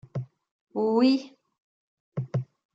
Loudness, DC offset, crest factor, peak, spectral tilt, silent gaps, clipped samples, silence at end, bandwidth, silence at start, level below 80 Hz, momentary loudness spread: -27 LUFS; under 0.1%; 18 dB; -10 dBFS; -8 dB/octave; 0.51-0.67 s, 1.58-2.12 s; under 0.1%; 0.3 s; 7.8 kHz; 0.15 s; -72 dBFS; 16 LU